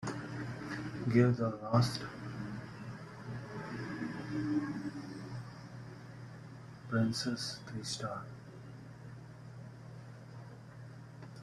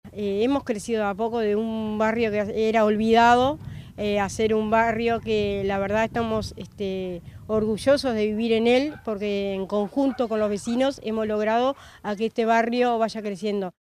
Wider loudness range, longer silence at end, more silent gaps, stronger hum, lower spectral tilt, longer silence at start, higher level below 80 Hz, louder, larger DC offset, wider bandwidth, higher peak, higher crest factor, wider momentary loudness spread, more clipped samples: first, 11 LU vs 4 LU; second, 0 s vs 0.2 s; neither; neither; about the same, -6 dB/octave vs -5.5 dB/octave; about the same, 0 s vs 0.05 s; second, -66 dBFS vs -50 dBFS; second, -37 LUFS vs -24 LUFS; neither; second, 12.5 kHz vs 14.5 kHz; second, -14 dBFS vs -6 dBFS; first, 24 dB vs 18 dB; first, 19 LU vs 9 LU; neither